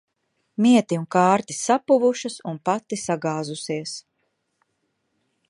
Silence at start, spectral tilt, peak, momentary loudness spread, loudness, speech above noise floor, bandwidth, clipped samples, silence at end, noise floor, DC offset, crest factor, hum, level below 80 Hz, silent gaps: 0.6 s; -5 dB/octave; -4 dBFS; 12 LU; -22 LUFS; 52 dB; 11.5 kHz; under 0.1%; 1.5 s; -74 dBFS; under 0.1%; 20 dB; none; -72 dBFS; none